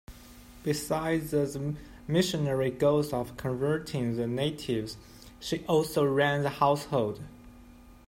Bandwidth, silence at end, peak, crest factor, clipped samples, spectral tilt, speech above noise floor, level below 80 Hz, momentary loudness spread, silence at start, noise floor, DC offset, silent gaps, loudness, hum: 16 kHz; 0.1 s; -10 dBFS; 20 dB; under 0.1%; -5.5 dB/octave; 23 dB; -54 dBFS; 11 LU; 0.1 s; -52 dBFS; under 0.1%; none; -29 LUFS; none